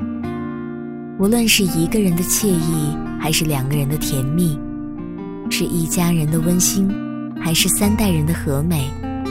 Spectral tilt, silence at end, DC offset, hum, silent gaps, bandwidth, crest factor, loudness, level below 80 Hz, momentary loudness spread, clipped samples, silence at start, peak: -4.5 dB/octave; 0 s; under 0.1%; none; none; 16.5 kHz; 16 dB; -18 LUFS; -34 dBFS; 13 LU; under 0.1%; 0 s; -2 dBFS